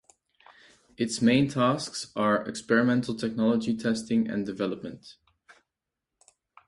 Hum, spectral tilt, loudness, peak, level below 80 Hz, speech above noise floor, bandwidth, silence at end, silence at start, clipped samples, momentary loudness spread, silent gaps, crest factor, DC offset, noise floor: none; -5.5 dB/octave; -27 LUFS; -8 dBFS; -64 dBFS; 60 dB; 11.5 kHz; 1.55 s; 1 s; under 0.1%; 10 LU; none; 20 dB; under 0.1%; -87 dBFS